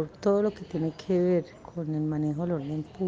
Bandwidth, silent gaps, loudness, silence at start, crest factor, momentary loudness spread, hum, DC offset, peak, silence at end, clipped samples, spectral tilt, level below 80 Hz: 7.6 kHz; none; -29 LUFS; 0 s; 16 dB; 9 LU; none; under 0.1%; -12 dBFS; 0 s; under 0.1%; -9 dB/octave; -60 dBFS